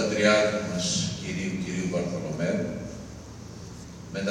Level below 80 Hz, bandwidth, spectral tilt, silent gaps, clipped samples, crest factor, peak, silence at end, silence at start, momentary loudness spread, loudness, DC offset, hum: -52 dBFS; 13.5 kHz; -4.5 dB/octave; none; under 0.1%; 22 dB; -6 dBFS; 0 s; 0 s; 21 LU; -27 LUFS; under 0.1%; none